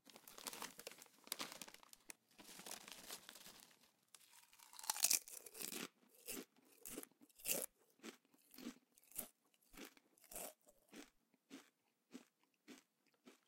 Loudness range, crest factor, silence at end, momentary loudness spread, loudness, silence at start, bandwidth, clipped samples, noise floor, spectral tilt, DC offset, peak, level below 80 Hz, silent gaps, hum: 15 LU; 38 dB; 0.1 s; 22 LU; -47 LUFS; 0.05 s; 17 kHz; under 0.1%; -79 dBFS; 0 dB/octave; under 0.1%; -14 dBFS; -82 dBFS; none; none